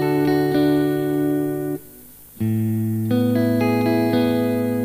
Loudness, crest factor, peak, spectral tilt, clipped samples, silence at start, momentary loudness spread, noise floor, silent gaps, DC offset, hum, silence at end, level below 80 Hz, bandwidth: -20 LUFS; 12 dB; -8 dBFS; -7.5 dB/octave; under 0.1%; 0 s; 6 LU; -43 dBFS; none; under 0.1%; 50 Hz at -55 dBFS; 0 s; -54 dBFS; 15.5 kHz